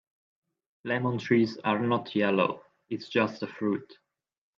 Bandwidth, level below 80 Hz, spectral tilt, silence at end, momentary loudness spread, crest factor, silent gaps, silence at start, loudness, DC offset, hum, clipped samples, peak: 7.4 kHz; -74 dBFS; -7 dB/octave; 0.65 s; 12 LU; 20 dB; none; 0.85 s; -28 LUFS; under 0.1%; none; under 0.1%; -10 dBFS